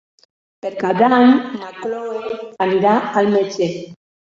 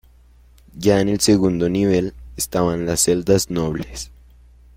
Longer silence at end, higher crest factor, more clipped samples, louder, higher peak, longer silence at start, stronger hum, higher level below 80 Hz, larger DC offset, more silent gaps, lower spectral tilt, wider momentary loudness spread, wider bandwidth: second, 0.4 s vs 0.7 s; about the same, 16 dB vs 18 dB; neither; about the same, -17 LUFS vs -19 LUFS; about the same, -2 dBFS vs -2 dBFS; about the same, 0.65 s vs 0.75 s; second, none vs 60 Hz at -40 dBFS; second, -62 dBFS vs -42 dBFS; neither; neither; first, -6.5 dB/octave vs -5 dB/octave; first, 16 LU vs 13 LU; second, 7.4 kHz vs 16.5 kHz